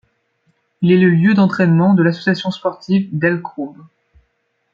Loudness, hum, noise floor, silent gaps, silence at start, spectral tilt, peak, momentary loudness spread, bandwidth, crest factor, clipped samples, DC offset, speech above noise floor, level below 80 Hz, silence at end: -15 LUFS; none; -67 dBFS; none; 0.8 s; -8.5 dB/octave; -2 dBFS; 11 LU; 7 kHz; 14 dB; under 0.1%; under 0.1%; 52 dB; -58 dBFS; 1 s